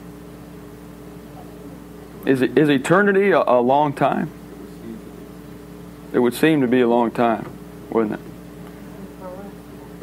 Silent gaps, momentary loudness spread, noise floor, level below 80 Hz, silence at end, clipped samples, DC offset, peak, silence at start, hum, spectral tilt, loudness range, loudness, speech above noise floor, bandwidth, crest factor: none; 23 LU; -38 dBFS; -50 dBFS; 0 s; under 0.1%; under 0.1%; -2 dBFS; 0 s; none; -6.5 dB/octave; 4 LU; -18 LUFS; 21 dB; 16 kHz; 18 dB